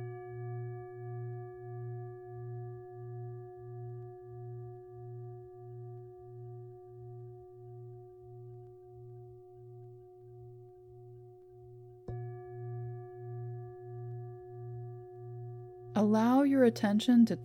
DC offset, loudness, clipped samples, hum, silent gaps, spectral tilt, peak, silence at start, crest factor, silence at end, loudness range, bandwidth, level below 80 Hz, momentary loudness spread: under 0.1%; -35 LUFS; under 0.1%; none; none; -7.5 dB/octave; -16 dBFS; 0 s; 20 dB; 0 s; 19 LU; 13.5 kHz; -70 dBFS; 26 LU